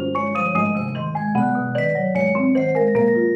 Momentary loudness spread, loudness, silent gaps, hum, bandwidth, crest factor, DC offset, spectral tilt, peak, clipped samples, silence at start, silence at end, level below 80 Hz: 5 LU; -20 LUFS; none; none; 7.8 kHz; 12 dB; under 0.1%; -9 dB/octave; -8 dBFS; under 0.1%; 0 s; 0 s; -60 dBFS